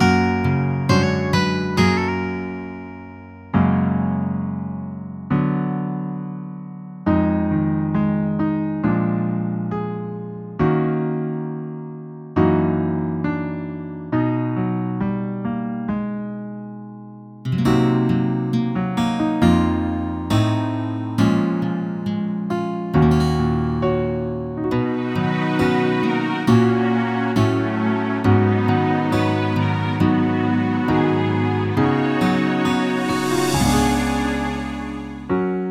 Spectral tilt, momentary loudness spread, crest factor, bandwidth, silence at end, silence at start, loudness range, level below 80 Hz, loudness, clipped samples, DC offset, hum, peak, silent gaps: -7 dB/octave; 12 LU; 18 dB; 15.5 kHz; 0 s; 0 s; 5 LU; -40 dBFS; -20 LUFS; under 0.1%; under 0.1%; none; -2 dBFS; none